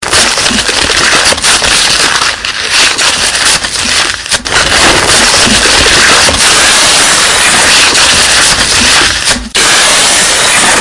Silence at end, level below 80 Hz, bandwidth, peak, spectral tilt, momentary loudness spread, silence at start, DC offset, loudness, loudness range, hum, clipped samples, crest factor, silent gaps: 0 s; -28 dBFS; 12 kHz; 0 dBFS; -0.5 dB/octave; 5 LU; 0 s; under 0.1%; -4 LUFS; 3 LU; none; 4%; 6 dB; none